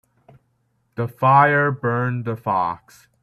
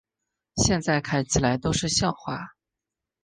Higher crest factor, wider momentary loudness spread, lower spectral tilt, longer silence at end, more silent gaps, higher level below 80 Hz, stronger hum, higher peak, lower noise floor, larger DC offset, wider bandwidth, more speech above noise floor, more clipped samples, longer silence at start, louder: about the same, 18 dB vs 20 dB; first, 15 LU vs 12 LU; first, -8.5 dB/octave vs -4 dB/octave; second, 0.45 s vs 0.75 s; neither; second, -60 dBFS vs -44 dBFS; neither; first, -2 dBFS vs -6 dBFS; second, -67 dBFS vs -87 dBFS; neither; first, 13.5 kHz vs 10 kHz; second, 48 dB vs 63 dB; neither; first, 1 s vs 0.55 s; first, -19 LUFS vs -24 LUFS